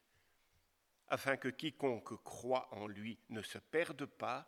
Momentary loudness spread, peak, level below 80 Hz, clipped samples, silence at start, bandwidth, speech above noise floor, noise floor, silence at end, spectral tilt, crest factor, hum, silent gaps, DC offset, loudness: 9 LU; -18 dBFS; -82 dBFS; under 0.1%; 1.1 s; 18.5 kHz; 37 dB; -78 dBFS; 0.05 s; -4.5 dB/octave; 24 dB; none; none; under 0.1%; -42 LUFS